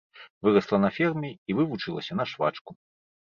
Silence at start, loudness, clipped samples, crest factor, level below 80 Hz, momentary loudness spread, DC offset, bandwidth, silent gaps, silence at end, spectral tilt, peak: 0.15 s; -27 LUFS; under 0.1%; 20 dB; -64 dBFS; 9 LU; under 0.1%; 7 kHz; 0.30-0.41 s, 1.38-1.46 s, 2.61-2.65 s; 0.5 s; -7.5 dB/octave; -8 dBFS